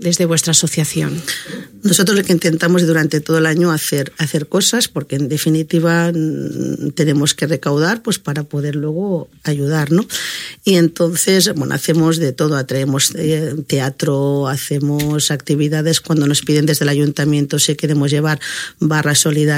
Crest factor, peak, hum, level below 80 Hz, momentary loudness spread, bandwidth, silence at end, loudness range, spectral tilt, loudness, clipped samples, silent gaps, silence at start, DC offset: 16 dB; 0 dBFS; none; -54 dBFS; 8 LU; 16.5 kHz; 0 s; 3 LU; -4.5 dB/octave; -15 LUFS; under 0.1%; none; 0 s; under 0.1%